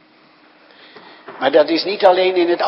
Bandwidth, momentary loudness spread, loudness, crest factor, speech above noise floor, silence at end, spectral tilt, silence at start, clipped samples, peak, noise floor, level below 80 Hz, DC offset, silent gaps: 5.8 kHz; 8 LU; -15 LUFS; 18 dB; 36 dB; 0 s; -6 dB/octave; 1.3 s; under 0.1%; 0 dBFS; -50 dBFS; -70 dBFS; under 0.1%; none